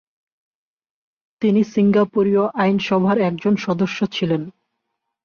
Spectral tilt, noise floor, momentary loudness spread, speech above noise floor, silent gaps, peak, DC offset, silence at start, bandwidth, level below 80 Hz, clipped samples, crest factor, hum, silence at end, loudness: -7.5 dB/octave; -77 dBFS; 6 LU; 59 dB; none; -6 dBFS; under 0.1%; 1.4 s; 6.8 kHz; -60 dBFS; under 0.1%; 14 dB; none; 0.75 s; -19 LUFS